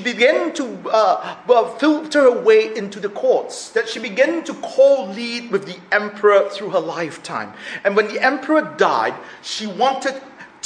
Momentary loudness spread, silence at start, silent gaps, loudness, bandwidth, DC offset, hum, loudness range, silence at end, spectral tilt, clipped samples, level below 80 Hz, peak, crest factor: 11 LU; 0 s; none; -18 LUFS; 10.5 kHz; under 0.1%; none; 3 LU; 0.2 s; -4 dB/octave; under 0.1%; -70 dBFS; 0 dBFS; 18 dB